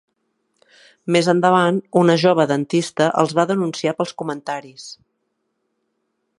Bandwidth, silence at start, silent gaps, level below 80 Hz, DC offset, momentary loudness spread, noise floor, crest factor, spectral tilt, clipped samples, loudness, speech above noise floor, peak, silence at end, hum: 11.5 kHz; 1.05 s; none; -68 dBFS; under 0.1%; 15 LU; -72 dBFS; 20 dB; -5.5 dB/octave; under 0.1%; -18 LUFS; 55 dB; 0 dBFS; 1.45 s; none